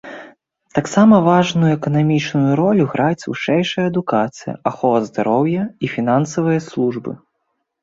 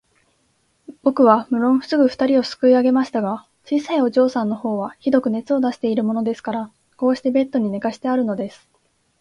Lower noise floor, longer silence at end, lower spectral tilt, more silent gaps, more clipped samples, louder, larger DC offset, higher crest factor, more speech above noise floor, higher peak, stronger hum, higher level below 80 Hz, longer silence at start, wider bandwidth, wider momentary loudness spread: first, -72 dBFS vs -64 dBFS; about the same, 0.65 s vs 0.7 s; about the same, -7 dB/octave vs -6.5 dB/octave; neither; neither; about the same, -17 LUFS vs -19 LUFS; neither; about the same, 16 dB vs 18 dB; first, 56 dB vs 46 dB; about the same, -2 dBFS vs -2 dBFS; neither; first, -56 dBFS vs -64 dBFS; second, 0.05 s vs 0.9 s; second, 7.8 kHz vs 9.4 kHz; about the same, 11 LU vs 10 LU